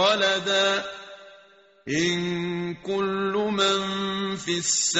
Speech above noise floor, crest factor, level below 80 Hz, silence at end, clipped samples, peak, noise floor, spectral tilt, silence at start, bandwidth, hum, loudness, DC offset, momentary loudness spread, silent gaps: 30 dB; 18 dB; -62 dBFS; 0 s; under 0.1%; -8 dBFS; -54 dBFS; -2.5 dB/octave; 0 s; 8.2 kHz; none; -24 LUFS; under 0.1%; 9 LU; none